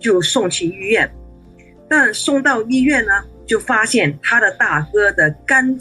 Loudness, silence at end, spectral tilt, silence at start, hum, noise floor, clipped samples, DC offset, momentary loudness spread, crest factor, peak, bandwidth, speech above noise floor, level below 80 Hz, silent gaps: -15 LUFS; 0 s; -3.5 dB/octave; 0 s; none; -43 dBFS; under 0.1%; under 0.1%; 5 LU; 14 dB; -2 dBFS; 12.5 kHz; 28 dB; -44 dBFS; none